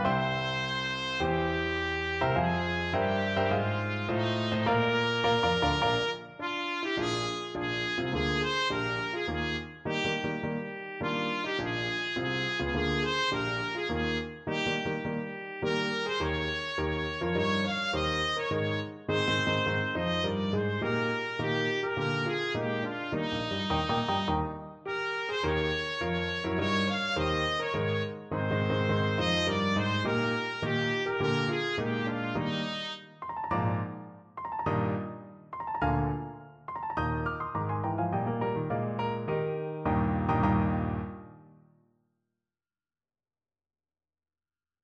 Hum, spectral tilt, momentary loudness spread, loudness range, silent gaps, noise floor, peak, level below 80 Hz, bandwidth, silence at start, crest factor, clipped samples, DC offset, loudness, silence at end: none; -5.5 dB/octave; 7 LU; 4 LU; none; under -90 dBFS; -14 dBFS; -48 dBFS; 9.4 kHz; 0 s; 16 dB; under 0.1%; under 0.1%; -30 LUFS; 3.35 s